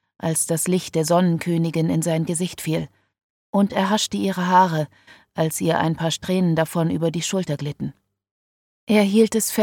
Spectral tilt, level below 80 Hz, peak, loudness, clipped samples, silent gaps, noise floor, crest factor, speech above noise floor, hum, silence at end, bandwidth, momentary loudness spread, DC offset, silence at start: -5 dB/octave; -58 dBFS; -4 dBFS; -21 LUFS; under 0.1%; 3.23-3.53 s, 8.31-8.87 s; under -90 dBFS; 18 dB; over 70 dB; none; 0 s; 17.5 kHz; 10 LU; under 0.1%; 0.25 s